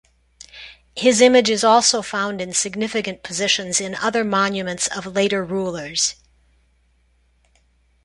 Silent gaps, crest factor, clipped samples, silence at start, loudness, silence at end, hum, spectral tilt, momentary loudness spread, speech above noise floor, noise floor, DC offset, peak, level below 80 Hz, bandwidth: none; 20 dB; under 0.1%; 0.55 s; -19 LUFS; 1.9 s; none; -2.5 dB/octave; 11 LU; 41 dB; -60 dBFS; under 0.1%; -2 dBFS; -56 dBFS; 11.5 kHz